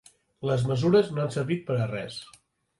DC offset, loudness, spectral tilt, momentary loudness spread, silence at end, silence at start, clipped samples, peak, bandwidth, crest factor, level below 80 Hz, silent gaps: under 0.1%; -26 LUFS; -7 dB/octave; 13 LU; 0.55 s; 0.4 s; under 0.1%; -10 dBFS; 11.5 kHz; 18 dB; -60 dBFS; none